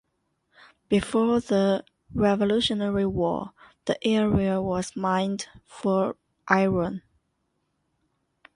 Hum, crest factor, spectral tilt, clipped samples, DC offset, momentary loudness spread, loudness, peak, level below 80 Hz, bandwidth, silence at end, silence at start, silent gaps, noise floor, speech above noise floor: none; 20 dB; -6 dB/octave; under 0.1%; under 0.1%; 11 LU; -25 LUFS; -6 dBFS; -50 dBFS; 11.5 kHz; 1.55 s; 0.9 s; none; -75 dBFS; 51 dB